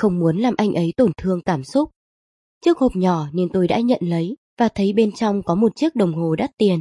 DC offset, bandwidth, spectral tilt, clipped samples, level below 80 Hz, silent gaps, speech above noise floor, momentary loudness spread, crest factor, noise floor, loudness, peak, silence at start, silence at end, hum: under 0.1%; 11.5 kHz; -7.5 dB/octave; under 0.1%; -48 dBFS; 1.96-2.61 s, 4.38-4.57 s; over 72 dB; 4 LU; 14 dB; under -90 dBFS; -20 LUFS; -4 dBFS; 0 s; 0 s; none